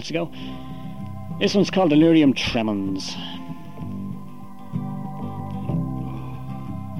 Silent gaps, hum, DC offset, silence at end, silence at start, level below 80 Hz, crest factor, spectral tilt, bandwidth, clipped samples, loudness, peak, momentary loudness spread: none; none; 1%; 0 s; 0 s; -48 dBFS; 18 dB; -6 dB/octave; 12.5 kHz; under 0.1%; -23 LUFS; -6 dBFS; 19 LU